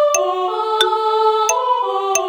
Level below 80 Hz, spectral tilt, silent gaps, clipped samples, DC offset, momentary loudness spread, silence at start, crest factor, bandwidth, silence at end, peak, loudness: -64 dBFS; 0.5 dB/octave; none; under 0.1%; under 0.1%; 4 LU; 0 s; 14 dB; over 20 kHz; 0 s; -2 dBFS; -16 LUFS